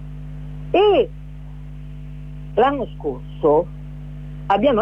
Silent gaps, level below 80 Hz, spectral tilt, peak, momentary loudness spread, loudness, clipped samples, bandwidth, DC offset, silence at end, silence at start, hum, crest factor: none; -36 dBFS; -8 dB/octave; -6 dBFS; 20 LU; -19 LUFS; under 0.1%; 5.6 kHz; under 0.1%; 0 s; 0 s; 50 Hz at -35 dBFS; 16 dB